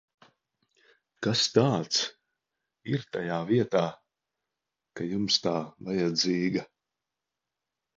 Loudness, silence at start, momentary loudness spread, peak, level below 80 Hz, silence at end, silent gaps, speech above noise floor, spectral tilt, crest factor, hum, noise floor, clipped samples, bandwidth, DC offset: -28 LUFS; 1.2 s; 10 LU; -8 dBFS; -68 dBFS; 1.35 s; none; 60 dB; -4.5 dB/octave; 24 dB; none; -88 dBFS; under 0.1%; 7.8 kHz; under 0.1%